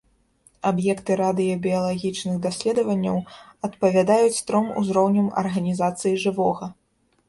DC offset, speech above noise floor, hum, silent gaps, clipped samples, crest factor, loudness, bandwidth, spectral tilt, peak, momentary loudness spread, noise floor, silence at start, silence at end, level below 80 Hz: under 0.1%; 38 dB; none; none; under 0.1%; 16 dB; -22 LUFS; 11.5 kHz; -6 dB/octave; -6 dBFS; 8 LU; -60 dBFS; 0.65 s; 0.55 s; -60 dBFS